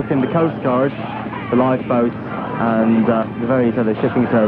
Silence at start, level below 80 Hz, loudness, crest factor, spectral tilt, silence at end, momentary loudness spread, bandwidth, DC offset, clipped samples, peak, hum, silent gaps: 0 s; -50 dBFS; -18 LUFS; 14 dB; -10.5 dB/octave; 0 s; 9 LU; 4.5 kHz; under 0.1%; under 0.1%; -4 dBFS; none; none